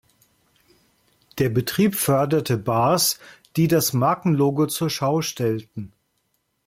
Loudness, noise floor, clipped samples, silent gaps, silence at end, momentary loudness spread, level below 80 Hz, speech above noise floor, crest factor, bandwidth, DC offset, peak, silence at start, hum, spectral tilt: -21 LUFS; -71 dBFS; under 0.1%; none; 0.8 s; 12 LU; -56 dBFS; 51 dB; 16 dB; 16.5 kHz; under 0.1%; -8 dBFS; 1.35 s; none; -5 dB/octave